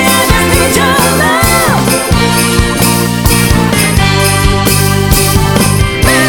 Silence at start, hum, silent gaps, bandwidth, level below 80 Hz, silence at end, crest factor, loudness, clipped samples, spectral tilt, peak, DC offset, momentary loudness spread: 0 s; none; none; over 20 kHz; -18 dBFS; 0 s; 8 dB; -8 LUFS; 1%; -4 dB/octave; 0 dBFS; under 0.1%; 2 LU